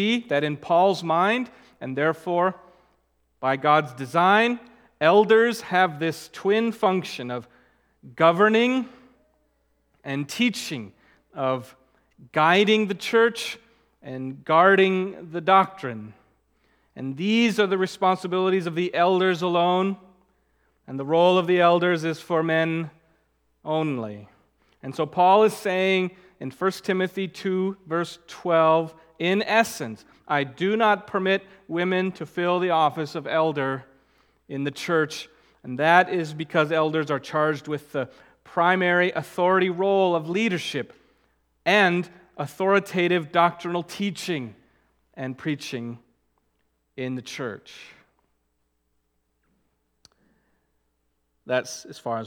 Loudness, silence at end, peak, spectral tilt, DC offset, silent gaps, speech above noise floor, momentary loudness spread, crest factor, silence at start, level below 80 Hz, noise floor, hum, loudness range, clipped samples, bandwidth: -23 LUFS; 0 s; -2 dBFS; -5.5 dB/octave; under 0.1%; none; 50 dB; 16 LU; 22 dB; 0 s; -70 dBFS; -73 dBFS; none; 9 LU; under 0.1%; 18 kHz